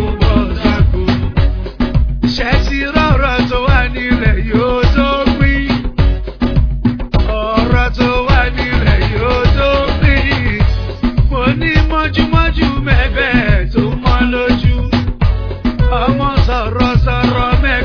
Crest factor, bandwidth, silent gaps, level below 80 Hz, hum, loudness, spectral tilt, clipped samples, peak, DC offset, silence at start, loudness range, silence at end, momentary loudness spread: 12 dB; 5.4 kHz; none; -16 dBFS; none; -13 LUFS; -7.5 dB/octave; under 0.1%; 0 dBFS; 0.6%; 0 s; 1 LU; 0 s; 4 LU